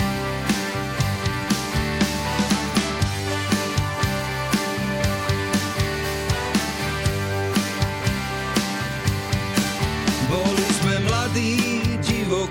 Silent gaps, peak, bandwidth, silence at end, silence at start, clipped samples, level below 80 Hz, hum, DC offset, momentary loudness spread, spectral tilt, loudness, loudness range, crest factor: none; -8 dBFS; 17 kHz; 0 s; 0 s; under 0.1%; -36 dBFS; none; under 0.1%; 4 LU; -4.5 dB/octave; -23 LUFS; 2 LU; 14 dB